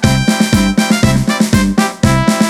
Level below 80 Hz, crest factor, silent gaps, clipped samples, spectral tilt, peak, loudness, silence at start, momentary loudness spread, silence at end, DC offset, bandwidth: -26 dBFS; 12 dB; none; under 0.1%; -5 dB/octave; 0 dBFS; -12 LUFS; 0 s; 1 LU; 0 s; under 0.1%; 16 kHz